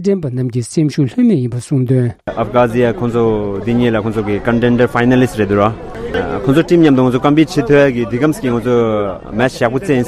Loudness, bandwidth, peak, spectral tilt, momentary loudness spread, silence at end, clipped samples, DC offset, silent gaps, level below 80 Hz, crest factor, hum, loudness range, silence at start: -14 LUFS; 13.5 kHz; 0 dBFS; -7 dB/octave; 7 LU; 0 s; under 0.1%; under 0.1%; none; -38 dBFS; 12 dB; none; 2 LU; 0 s